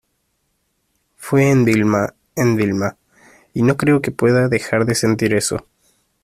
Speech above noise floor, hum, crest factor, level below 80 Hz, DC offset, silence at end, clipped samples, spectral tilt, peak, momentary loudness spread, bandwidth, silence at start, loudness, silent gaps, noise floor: 52 dB; none; 16 dB; -50 dBFS; under 0.1%; 0.65 s; under 0.1%; -6 dB/octave; -2 dBFS; 10 LU; 15 kHz; 1.2 s; -17 LUFS; none; -68 dBFS